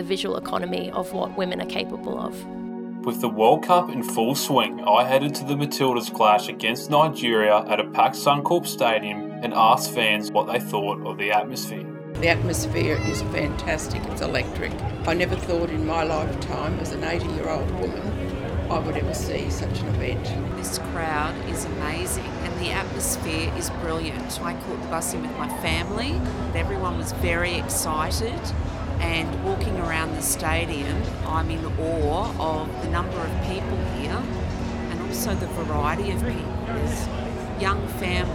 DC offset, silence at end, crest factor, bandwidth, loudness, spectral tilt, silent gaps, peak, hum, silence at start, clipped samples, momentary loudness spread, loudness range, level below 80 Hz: under 0.1%; 0 s; 22 dB; 16.5 kHz; -24 LUFS; -4.5 dB/octave; none; -2 dBFS; none; 0 s; under 0.1%; 9 LU; 6 LU; -36 dBFS